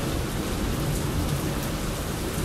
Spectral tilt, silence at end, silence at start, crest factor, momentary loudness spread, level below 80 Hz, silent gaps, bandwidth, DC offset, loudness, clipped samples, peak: -5 dB/octave; 0 s; 0 s; 12 dB; 3 LU; -34 dBFS; none; 16 kHz; under 0.1%; -28 LUFS; under 0.1%; -14 dBFS